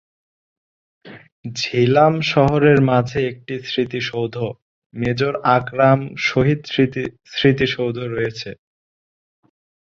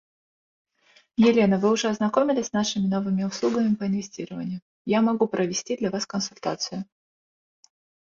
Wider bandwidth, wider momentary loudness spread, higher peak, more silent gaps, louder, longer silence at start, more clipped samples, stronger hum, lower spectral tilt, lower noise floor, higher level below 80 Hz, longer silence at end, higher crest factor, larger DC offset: about the same, 7.4 kHz vs 7.6 kHz; about the same, 13 LU vs 13 LU; first, -2 dBFS vs -6 dBFS; first, 1.32-1.43 s, 4.62-4.90 s vs 4.62-4.85 s; first, -18 LUFS vs -24 LUFS; second, 1.05 s vs 1.2 s; neither; neither; first, -6.5 dB/octave vs -5 dB/octave; about the same, under -90 dBFS vs under -90 dBFS; first, -50 dBFS vs -64 dBFS; about the same, 1.25 s vs 1.25 s; about the same, 18 dB vs 18 dB; neither